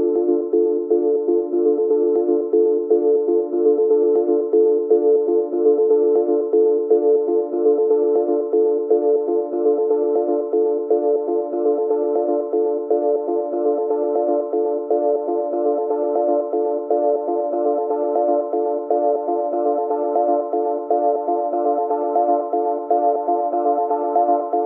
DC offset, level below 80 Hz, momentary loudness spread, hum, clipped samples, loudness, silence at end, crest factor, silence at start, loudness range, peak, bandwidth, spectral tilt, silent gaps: under 0.1%; -90 dBFS; 4 LU; none; under 0.1%; -19 LUFS; 0 s; 12 dB; 0 s; 3 LU; -6 dBFS; 1.9 kHz; -11 dB/octave; none